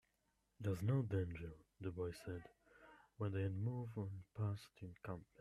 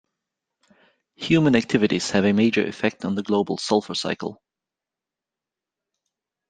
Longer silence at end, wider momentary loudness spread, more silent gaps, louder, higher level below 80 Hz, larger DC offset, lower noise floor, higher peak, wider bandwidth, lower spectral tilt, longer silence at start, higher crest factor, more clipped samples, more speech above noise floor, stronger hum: second, 0.15 s vs 2.15 s; first, 16 LU vs 10 LU; neither; second, -45 LUFS vs -22 LUFS; second, -70 dBFS vs -60 dBFS; neither; second, -83 dBFS vs -88 dBFS; second, -28 dBFS vs -4 dBFS; first, 13.5 kHz vs 9.6 kHz; first, -8.5 dB/octave vs -5.5 dB/octave; second, 0.6 s vs 1.2 s; about the same, 18 dB vs 22 dB; neither; second, 39 dB vs 67 dB; neither